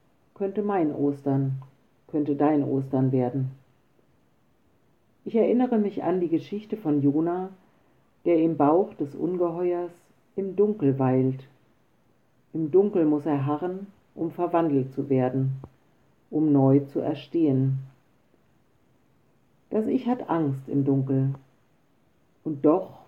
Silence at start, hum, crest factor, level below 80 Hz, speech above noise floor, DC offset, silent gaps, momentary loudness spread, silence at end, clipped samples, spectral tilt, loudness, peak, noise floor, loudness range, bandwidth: 0.4 s; none; 18 dB; -72 dBFS; 42 dB; under 0.1%; none; 12 LU; 0.15 s; under 0.1%; -11 dB/octave; -25 LUFS; -8 dBFS; -66 dBFS; 3 LU; 5.2 kHz